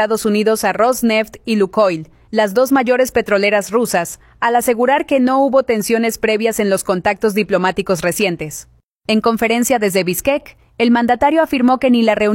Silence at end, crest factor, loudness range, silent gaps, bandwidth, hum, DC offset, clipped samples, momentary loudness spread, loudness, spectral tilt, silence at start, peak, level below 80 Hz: 0 s; 14 dB; 2 LU; 8.84-9.01 s; 16.5 kHz; none; under 0.1%; under 0.1%; 6 LU; -15 LUFS; -4.5 dB/octave; 0 s; -2 dBFS; -48 dBFS